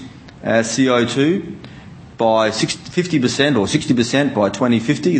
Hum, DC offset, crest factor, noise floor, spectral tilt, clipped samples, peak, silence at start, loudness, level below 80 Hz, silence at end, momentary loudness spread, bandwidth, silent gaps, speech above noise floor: none; under 0.1%; 16 dB; -38 dBFS; -5 dB/octave; under 0.1%; 0 dBFS; 0 s; -17 LUFS; -52 dBFS; 0 s; 10 LU; 8.8 kHz; none; 21 dB